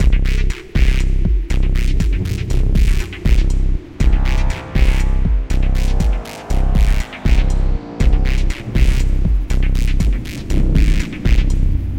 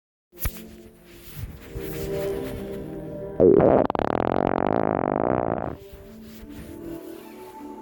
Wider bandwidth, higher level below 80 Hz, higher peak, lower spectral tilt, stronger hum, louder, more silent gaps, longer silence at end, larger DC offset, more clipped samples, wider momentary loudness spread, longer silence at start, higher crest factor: second, 9.2 kHz vs 19.5 kHz; first, -14 dBFS vs -44 dBFS; first, 0 dBFS vs -6 dBFS; about the same, -6.5 dB/octave vs -7.5 dB/octave; neither; first, -19 LUFS vs -24 LUFS; neither; about the same, 0 s vs 0 s; neither; neither; second, 4 LU vs 22 LU; second, 0 s vs 0.35 s; second, 14 dB vs 20 dB